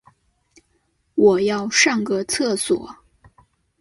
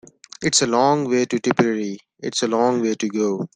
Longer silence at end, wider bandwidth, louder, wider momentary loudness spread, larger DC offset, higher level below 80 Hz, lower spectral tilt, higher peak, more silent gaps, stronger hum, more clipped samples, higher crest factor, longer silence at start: first, 0.85 s vs 0.1 s; first, 12 kHz vs 10 kHz; about the same, -19 LUFS vs -20 LUFS; about the same, 9 LU vs 9 LU; neither; about the same, -58 dBFS vs -62 dBFS; about the same, -3 dB/octave vs -4 dB/octave; about the same, -2 dBFS vs -2 dBFS; neither; neither; neither; about the same, 20 dB vs 18 dB; first, 1.15 s vs 0.4 s